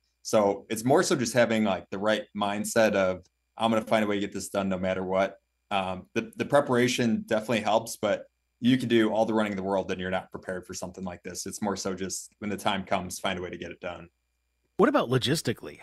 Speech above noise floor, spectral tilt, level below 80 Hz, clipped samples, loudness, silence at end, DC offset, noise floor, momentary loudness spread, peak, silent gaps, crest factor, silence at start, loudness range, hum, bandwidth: 49 dB; -4.5 dB/octave; -64 dBFS; under 0.1%; -27 LUFS; 0 s; under 0.1%; -76 dBFS; 13 LU; -8 dBFS; none; 20 dB; 0.25 s; 6 LU; none; 15.5 kHz